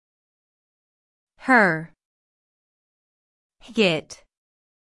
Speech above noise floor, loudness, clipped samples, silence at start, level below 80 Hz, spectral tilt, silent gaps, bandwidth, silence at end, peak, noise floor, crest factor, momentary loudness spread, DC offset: over 70 dB; -20 LUFS; under 0.1%; 1.45 s; -68 dBFS; -5 dB/octave; 2.05-3.50 s; 12 kHz; 0.75 s; -4 dBFS; under -90 dBFS; 22 dB; 13 LU; under 0.1%